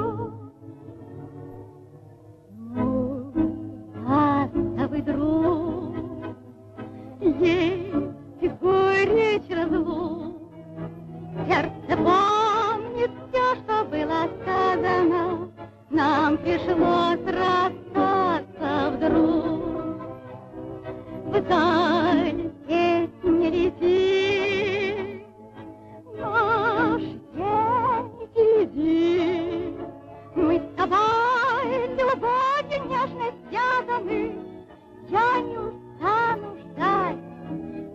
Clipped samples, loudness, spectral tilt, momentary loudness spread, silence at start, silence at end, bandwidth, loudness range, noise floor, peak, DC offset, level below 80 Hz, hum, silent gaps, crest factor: under 0.1%; -23 LUFS; -6.5 dB/octave; 18 LU; 0 s; 0 s; 7.8 kHz; 4 LU; -48 dBFS; -8 dBFS; under 0.1%; -50 dBFS; none; none; 16 dB